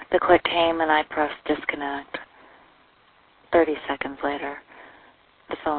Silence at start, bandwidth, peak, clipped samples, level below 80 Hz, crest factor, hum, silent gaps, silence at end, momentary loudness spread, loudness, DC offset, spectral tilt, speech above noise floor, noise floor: 0 s; 4.5 kHz; -2 dBFS; under 0.1%; -54 dBFS; 22 dB; none; none; 0 s; 16 LU; -23 LUFS; under 0.1%; -8 dB/octave; 35 dB; -58 dBFS